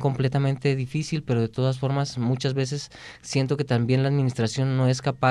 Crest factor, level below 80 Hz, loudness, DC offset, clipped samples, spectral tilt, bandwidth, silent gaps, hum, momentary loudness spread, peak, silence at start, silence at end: 16 dB; -56 dBFS; -25 LUFS; under 0.1%; under 0.1%; -6.5 dB/octave; 10.5 kHz; none; none; 6 LU; -8 dBFS; 0 s; 0 s